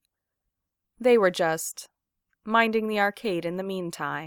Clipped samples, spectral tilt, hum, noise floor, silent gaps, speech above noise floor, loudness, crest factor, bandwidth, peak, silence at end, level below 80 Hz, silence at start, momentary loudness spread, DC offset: under 0.1%; -4 dB/octave; none; -83 dBFS; none; 58 dB; -25 LUFS; 20 dB; 18.5 kHz; -6 dBFS; 0 s; -70 dBFS; 1 s; 12 LU; under 0.1%